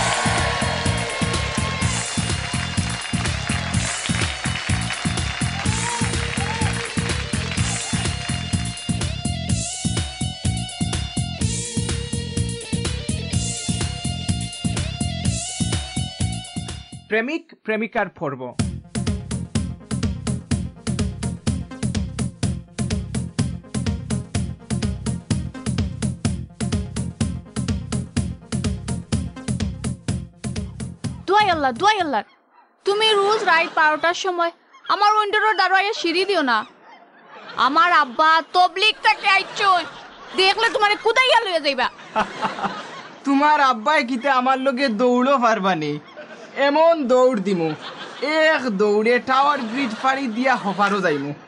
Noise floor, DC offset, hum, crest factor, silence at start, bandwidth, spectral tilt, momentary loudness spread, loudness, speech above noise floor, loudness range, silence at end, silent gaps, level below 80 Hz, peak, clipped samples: -52 dBFS; under 0.1%; none; 18 dB; 0 s; 11 kHz; -4 dB/octave; 11 LU; -21 LUFS; 34 dB; 8 LU; 0 s; none; -36 dBFS; -4 dBFS; under 0.1%